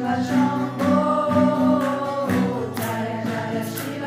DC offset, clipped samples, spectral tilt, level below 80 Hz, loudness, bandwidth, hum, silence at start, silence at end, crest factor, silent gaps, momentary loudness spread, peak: under 0.1%; under 0.1%; -6.5 dB/octave; -64 dBFS; -22 LUFS; 16 kHz; none; 0 s; 0 s; 14 dB; none; 7 LU; -6 dBFS